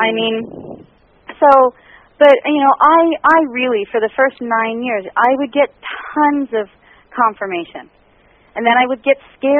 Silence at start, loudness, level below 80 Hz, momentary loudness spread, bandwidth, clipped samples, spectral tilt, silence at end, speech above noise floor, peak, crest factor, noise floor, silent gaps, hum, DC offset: 0 s; -14 LUFS; -58 dBFS; 15 LU; 4.8 kHz; under 0.1%; -1.5 dB/octave; 0 s; 37 dB; 0 dBFS; 14 dB; -51 dBFS; none; none; under 0.1%